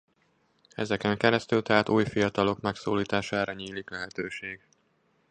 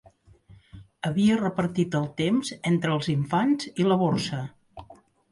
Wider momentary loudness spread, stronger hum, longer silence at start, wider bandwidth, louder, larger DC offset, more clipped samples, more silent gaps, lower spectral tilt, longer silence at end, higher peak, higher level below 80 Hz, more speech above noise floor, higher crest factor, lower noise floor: first, 13 LU vs 8 LU; neither; about the same, 0.8 s vs 0.75 s; second, 9.8 kHz vs 11.5 kHz; second, -28 LUFS vs -25 LUFS; neither; neither; neither; about the same, -5.5 dB/octave vs -6.5 dB/octave; first, 0.75 s vs 0.4 s; first, -4 dBFS vs -12 dBFS; about the same, -60 dBFS vs -58 dBFS; first, 42 dB vs 30 dB; first, 24 dB vs 14 dB; first, -69 dBFS vs -54 dBFS